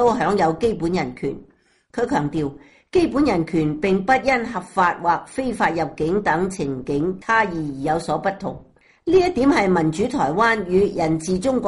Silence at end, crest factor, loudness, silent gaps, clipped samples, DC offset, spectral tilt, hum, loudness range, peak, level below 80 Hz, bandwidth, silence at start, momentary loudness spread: 0 s; 16 dB; -20 LUFS; none; under 0.1%; under 0.1%; -6 dB/octave; none; 3 LU; -6 dBFS; -46 dBFS; 11.5 kHz; 0 s; 9 LU